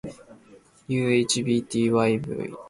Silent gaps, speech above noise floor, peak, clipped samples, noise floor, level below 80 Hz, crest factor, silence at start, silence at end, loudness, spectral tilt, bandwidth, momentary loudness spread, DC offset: none; 30 dB; -8 dBFS; under 0.1%; -53 dBFS; -60 dBFS; 16 dB; 0.05 s; 0 s; -24 LUFS; -5 dB/octave; 11.5 kHz; 9 LU; under 0.1%